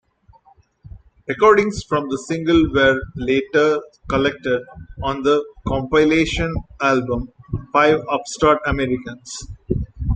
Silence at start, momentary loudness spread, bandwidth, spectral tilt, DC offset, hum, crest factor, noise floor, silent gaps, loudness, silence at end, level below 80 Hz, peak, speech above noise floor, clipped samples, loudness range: 0.95 s; 12 LU; 9.4 kHz; -5.5 dB/octave; under 0.1%; none; 18 dB; -54 dBFS; none; -19 LUFS; 0 s; -36 dBFS; -2 dBFS; 35 dB; under 0.1%; 2 LU